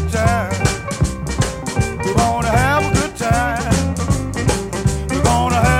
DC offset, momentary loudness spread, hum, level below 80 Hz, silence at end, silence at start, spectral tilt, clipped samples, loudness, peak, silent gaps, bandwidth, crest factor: under 0.1%; 6 LU; none; -26 dBFS; 0 s; 0 s; -5 dB/octave; under 0.1%; -18 LUFS; -2 dBFS; none; 16.5 kHz; 14 dB